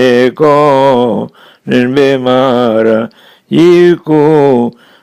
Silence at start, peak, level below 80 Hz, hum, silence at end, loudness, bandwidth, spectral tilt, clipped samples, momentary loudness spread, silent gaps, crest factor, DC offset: 0 s; 0 dBFS; -52 dBFS; none; 0.3 s; -9 LUFS; 12 kHz; -7 dB/octave; 0.7%; 10 LU; none; 8 dB; under 0.1%